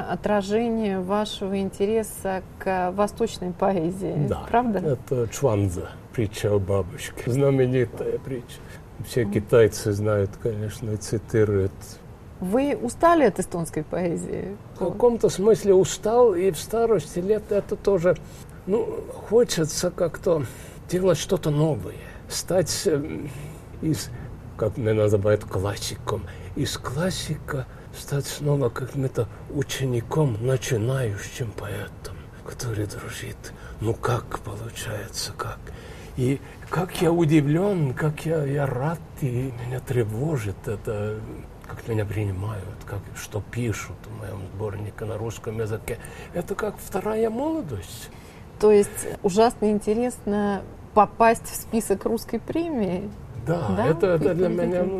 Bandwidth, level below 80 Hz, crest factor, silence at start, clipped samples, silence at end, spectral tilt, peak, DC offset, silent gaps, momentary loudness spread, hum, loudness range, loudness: 14.5 kHz; -46 dBFS; 20 dB; 0 s; under 0.1%; 0 s; -6 dB/octave; -4 dBFS; under 0.1%; none; 15 LU; none; 9 LU; -25 LUFS